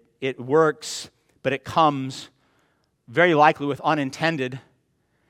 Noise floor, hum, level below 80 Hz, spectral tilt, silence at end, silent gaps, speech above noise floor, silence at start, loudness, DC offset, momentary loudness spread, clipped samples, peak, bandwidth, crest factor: -68 dBFS; none; -66 dBFS; -5 dB/octave; 0.7 s; none; 47 dB; 0.2 s; -22 LUFS; under 0.1%; 16 LU; under 0.1%; -2 dBFS; 15 kHz; 22 dB